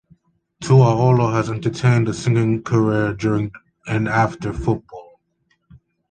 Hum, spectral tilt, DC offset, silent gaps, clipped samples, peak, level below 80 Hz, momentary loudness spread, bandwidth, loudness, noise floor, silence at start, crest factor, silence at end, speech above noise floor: none; -7.5 dB/octave; under 0.1%; none; under 0.1%; -2 dBFS; -44 dBFS; 11 LU; 9.2 kHz; -18 LUFS; -67 dBFS; 0.6 s; 18 dB; 1.1 s; 49 dB